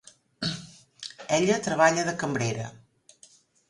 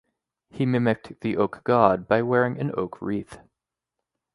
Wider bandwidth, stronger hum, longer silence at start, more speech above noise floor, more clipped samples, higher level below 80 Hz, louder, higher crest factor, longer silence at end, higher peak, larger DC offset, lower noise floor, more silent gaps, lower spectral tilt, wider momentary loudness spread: about the same, 11.5 kHz vs 11.5 kHz; neither; second, 0.4 s vs 0.55 s; second, 33 dB vs 62 dB; neither; second, -64 dBFS vs -58 dBFS; about the same, -26 LUFS vs -24 LUFS; about the same, 22 dB vs 24 dB; about the same, 0.95 s vs 0.95 s; second, -6 dBFS vs -2 dBFS; neither; second, -58 dBFS vs -85 dBFS; neither; second, -4 dB/octave vs -8.5 dB/octave; first, 18 LU vs 11 LU